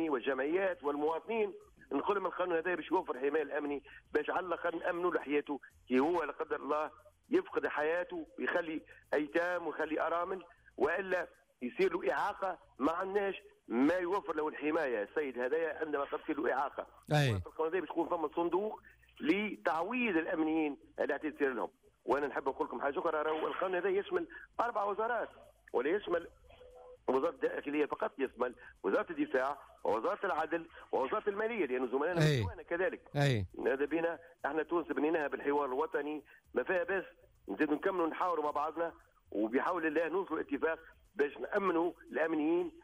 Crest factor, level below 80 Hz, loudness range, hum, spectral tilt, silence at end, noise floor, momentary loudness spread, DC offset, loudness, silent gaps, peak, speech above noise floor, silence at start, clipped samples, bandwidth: 16 dB; -68 dBFS; 2 LU; none; -7 dB/octave; 0.05 s; -56 dBFS; 7 LU; under 0.1%; -35 LUFS; none; -20 dBFS; 22 dB; 0 s; under 0.1%; 15.5 kHz